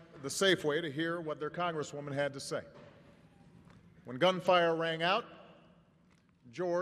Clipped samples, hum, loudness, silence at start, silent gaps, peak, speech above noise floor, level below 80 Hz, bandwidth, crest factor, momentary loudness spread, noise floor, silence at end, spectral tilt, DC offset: under 0.1%; none; -33 LUFS; 0 s; none; -14 dBFS; 34 dB; -74 dBFS; 15 kHz; 22 dB; 12 LU; -67 dBFS; 0 s; -4 dB/octave; under 0.1%